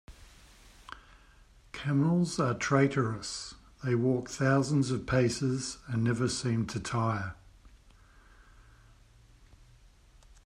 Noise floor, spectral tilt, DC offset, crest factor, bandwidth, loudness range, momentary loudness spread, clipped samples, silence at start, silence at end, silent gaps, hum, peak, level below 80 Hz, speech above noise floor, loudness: -59 dBFS; -6 dB/octave; under 0.1%; 20 dB; 11.5 kHz; 8 LU; 15 LU; under 0.1%; 0.1 s; 2.75 s; none; none; -12 dBFS; -56 dBFS; 30 dB; -30 LUFS